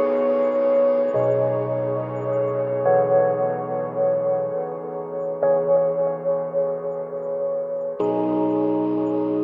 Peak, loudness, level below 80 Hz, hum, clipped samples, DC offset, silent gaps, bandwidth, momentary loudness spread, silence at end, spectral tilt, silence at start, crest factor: -8 dBFS; -22 LUFS; -70 dBFS; none; under 0.1%; under 0.1%; none; 3.6 kHz; 9 LU; 0 s; -10.5 dB/octave; 0 s; 14 dB